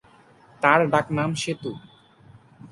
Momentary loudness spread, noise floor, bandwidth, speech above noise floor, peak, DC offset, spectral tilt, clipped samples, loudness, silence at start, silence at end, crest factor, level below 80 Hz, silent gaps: 16 LU; -54 dBFS; 11.5 kHz; 32 dB; -2 dBFS; under 0.1%; -5 dB/octave; under 0.1%; -22 LUFS; 0.6 s; 0.05 s; 24 dB; -62 dBFS; none